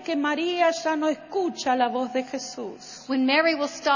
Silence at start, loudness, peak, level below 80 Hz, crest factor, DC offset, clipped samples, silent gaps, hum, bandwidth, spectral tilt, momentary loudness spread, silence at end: 0 s; -24 LUFS; -8 dBFS; -70 dBFS; 16 dB; under 0.1%; under 0.1%; none; none; 7.4 kHz; -2.5 dB/octave; 13 LU; 0 s